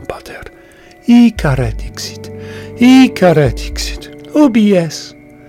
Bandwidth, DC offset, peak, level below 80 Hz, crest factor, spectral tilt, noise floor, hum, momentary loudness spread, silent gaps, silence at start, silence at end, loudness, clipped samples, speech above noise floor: 15 kHz; under 0.1%; 0 dBFS; -30 dBFS; 12 dB; -6 dB/octave; -40 dBFS; none; 21 LU; none; 0 s; 0.4 s; -11 LUFS; under 0.1%; 30 dB